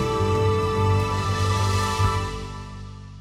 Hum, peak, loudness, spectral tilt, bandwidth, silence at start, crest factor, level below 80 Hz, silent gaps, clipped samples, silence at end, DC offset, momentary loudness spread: 50 Hz at -35 dBFS; -10 dBFS; -23 LUFS; -5.5 dB/octave; 14 kHz; 0 s; 12 dB; -38 dBFS; none; under 0.1%; 0 s; under 0.1%; 15 LU